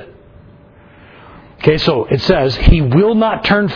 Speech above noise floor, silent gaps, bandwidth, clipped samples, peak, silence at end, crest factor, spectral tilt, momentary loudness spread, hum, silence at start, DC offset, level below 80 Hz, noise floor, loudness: 31 dB; none; 5.4 kHz; 0.4%; 0 dBFS; 0 s; 14 dB; -7.5 dB/octave; 3 LU; none; 0 s; under 0.1%; -22 dBFS; -42 dBFS; -13 LUFS